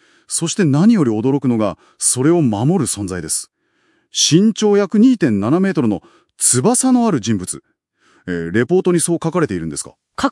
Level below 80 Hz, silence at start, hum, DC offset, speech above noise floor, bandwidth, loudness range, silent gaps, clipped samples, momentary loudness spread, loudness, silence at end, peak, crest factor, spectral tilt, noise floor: -56 dBFS; 0.3 s; none; under 0.1%; 46 dB; 12 kHz; 3 LU; none; under 0.1%; 11 LU; -16 LUFS; 0 s; 0 dBFS; 16 dB; -4.5 dB/octave; -61 dBFS